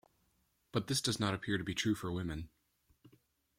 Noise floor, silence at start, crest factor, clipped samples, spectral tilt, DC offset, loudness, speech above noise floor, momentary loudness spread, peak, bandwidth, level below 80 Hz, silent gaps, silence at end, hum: -77 dBFS; 0.75 s; 20 dB; under 0.1%; -4 dB/octave; under 0.1%; -36 LUFS; 41 dB; 9 LU; -20 dBFS; 16.5 kHz; -62 dBFS; none; 1.1 s; none